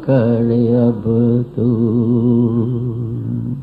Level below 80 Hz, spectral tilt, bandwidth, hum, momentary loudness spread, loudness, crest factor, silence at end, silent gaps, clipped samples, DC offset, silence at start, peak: -44 dBFS; -12 dB/octave; 4.6 kHz; none; 8 LU; -16 LUFS; 14 dB; 0 s; none; under 0.1%; under 0.1%; 0 s; -2 dBFS